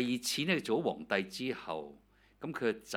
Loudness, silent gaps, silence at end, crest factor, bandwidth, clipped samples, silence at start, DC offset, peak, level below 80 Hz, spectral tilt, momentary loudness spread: -35 LUFS; none; 0 s; 22 dB; 17.5 kHz; under 0.1%; 0 s; under 0.1%; -14 dBFS; -70 dBFS; -4 dB/octave; 12 LU